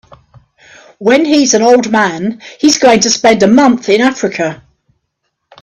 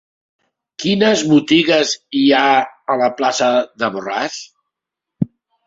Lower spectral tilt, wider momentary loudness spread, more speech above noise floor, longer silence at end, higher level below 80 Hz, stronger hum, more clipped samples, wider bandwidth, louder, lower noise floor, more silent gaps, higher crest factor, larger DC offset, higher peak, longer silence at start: about the same, -3.5 dB/octave vs -4 dB/octave; about the same, 10 LU vs 12 LU; second, 59 dB vs 68 dB; first, 1.05 s vs 0.4 s; first, -50 dBFS vs -58 dBFS; neither; neither; first, 11.5 kHz vs 7.8 kHz; first, -10 LUFS vs -16 LUFS; second, -69 dBFS vs -83 dBFS; neither; about the same, 12 dB vs 16 dB; neither; about the same, 0 dBFS vs 0 dBFS; first, 1 s vs 0.8 s